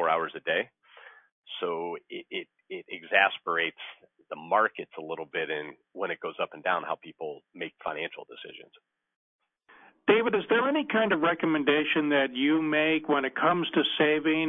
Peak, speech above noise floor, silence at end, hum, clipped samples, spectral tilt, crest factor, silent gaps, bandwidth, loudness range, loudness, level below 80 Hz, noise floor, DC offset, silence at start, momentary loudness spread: -8 dBFS; 30 dB; 0 s; none; under 0.1%; -7.5 dB/octave; 22 dB; 1.32-1.42 s, 9.16-9.39 s; 3.9 kHz; 9 LU; -27 LUFS; -80 dBFS; -58 dBFS; under 0.1%; 0 s; 16 LU